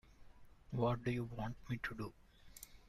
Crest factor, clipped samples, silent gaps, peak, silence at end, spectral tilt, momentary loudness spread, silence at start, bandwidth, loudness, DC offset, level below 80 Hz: 18 dB; under 0.1%; none; -24 dBFS; 0 s; -7 dB/octave; 19 LU; 0.1 s; 15 kHz; -42 LUFS; under 0.1%; -60 dBFS